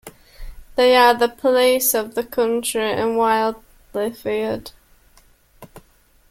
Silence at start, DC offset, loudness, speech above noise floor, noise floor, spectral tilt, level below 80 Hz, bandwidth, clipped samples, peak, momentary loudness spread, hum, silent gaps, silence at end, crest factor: 0.05 s; under 0.1%; -18 LUFS; 37 dB; -55 dBFS; -2.5 dB/octave; -46 dBFS; 17 kHz; under 0.1%; -2 dBFS; 13 LU; none; none; 0.5 s; 18 dB